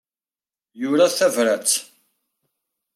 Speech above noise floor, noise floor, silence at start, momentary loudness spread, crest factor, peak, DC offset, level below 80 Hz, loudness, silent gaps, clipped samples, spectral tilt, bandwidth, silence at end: over 71 dB; under -90 dBFS; 0.75 s; 6 LU; 18 dB; -6 dBFS; under 0.1%; -80 dBFS; -19 LUFS; none; under 0.1%; -2 dB/octave; 16 kHz; 1.1 s